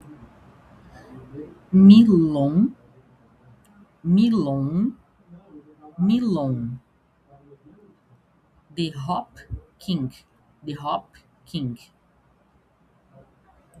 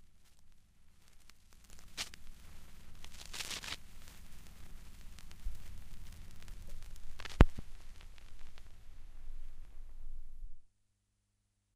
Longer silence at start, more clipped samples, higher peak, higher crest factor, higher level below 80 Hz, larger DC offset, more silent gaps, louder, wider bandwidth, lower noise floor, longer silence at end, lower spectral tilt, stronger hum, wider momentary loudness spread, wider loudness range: about the same, 0.1 s vs 0 s; neither; about the same, -2 dBFS vs -2 dBFS; second, 22 dB vs 36 dB; second, -54 dBFS vs -42 dBFS; neither; neither; first, -20 LUFS vs -39 LUFS; second, 7.8 kHz vs 15 kHz; second, -61 dBFS vs -80 dBFS; first, 2.05 s vs 1.1 s; first, -9 dB/octave vs -5 dB/octave; neither; first, 26 LU vs 19 LU; about the same, 16 LU vs 17 LU